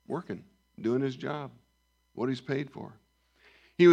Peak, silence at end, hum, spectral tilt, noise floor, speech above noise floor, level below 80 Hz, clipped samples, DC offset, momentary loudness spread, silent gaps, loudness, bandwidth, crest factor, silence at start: -10 dBFS; 0 s; none; -7.5 dB/octave; -72 dBFS; 39 dB; -74 dBFS; under 0.1%; under 0.1%; 16 LU; none; -32 LUFS; 7.8 kHz; 20 dB; 0.1 s